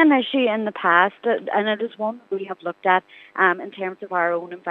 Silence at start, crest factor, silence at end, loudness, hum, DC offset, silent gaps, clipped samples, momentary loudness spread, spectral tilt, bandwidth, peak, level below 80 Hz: 0 s; 20 dB; 0 s; -21 LUFS; none; under 0.1%; none; under 0.1%; 12 LU; -7 dB/octave; 4.2 kHz; 0 dBFS; -84 dBFS